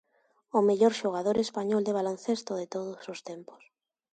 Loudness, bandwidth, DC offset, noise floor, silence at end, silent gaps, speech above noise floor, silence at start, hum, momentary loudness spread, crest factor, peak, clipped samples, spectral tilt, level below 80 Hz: -29 LUFS; 9.2 kHz; under 0.1%; -70 dBFS; 0.6 s; none; 41 dB; 0.55 s; none; 16 LU; 18 dB; -12 dBFS; under 0.1%; -5.5 dB/octave; -72 dBFS